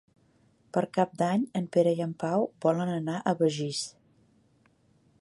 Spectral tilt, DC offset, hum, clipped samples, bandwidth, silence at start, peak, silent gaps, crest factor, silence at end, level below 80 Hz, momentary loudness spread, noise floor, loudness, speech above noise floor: -6 dB/octave; under 0.1%; none; under 0.1%; 11.5 kHz; 0.75 s; -10 dBFS; none; 18 dB; 1.3 s; -74 dBFS; 7 LU; -65 dBFS; -29 LUFS; 38 dB